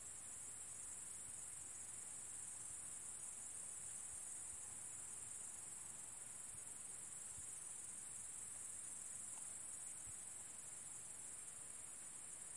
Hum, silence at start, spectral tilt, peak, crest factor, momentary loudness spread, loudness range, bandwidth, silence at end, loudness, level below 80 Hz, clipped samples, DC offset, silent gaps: none; 0 s; -0.5 dB/octave; -38 dBFS; 14 dB; 2 LU; 1 LU; 12 kHz; 0 s; -49 LUFS; -80 dBFS; under 0.1%; under 0.1%; none